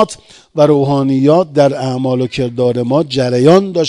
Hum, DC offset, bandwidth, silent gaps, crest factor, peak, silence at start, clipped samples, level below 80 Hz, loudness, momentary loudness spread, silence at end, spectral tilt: none; under 0.1%; 11 kHz; none; 12 dB; 0 dBFS; 0 s; 0.5%; -50 dBFS; -12 LUFS; 8 LU; 0 s; -7 dB/octave